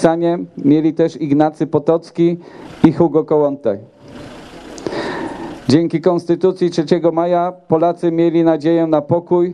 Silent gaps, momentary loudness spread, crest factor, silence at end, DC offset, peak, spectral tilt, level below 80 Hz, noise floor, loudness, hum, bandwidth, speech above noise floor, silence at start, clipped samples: none; 13 LU; 16 dB; 0 s; under 0.1%; 0 dBFS; -8 dB/octave; -52 dBFS; -35 dBFS; -16 LUFS; none; 10 kHz; 20 dB; 0 s; under 0.1%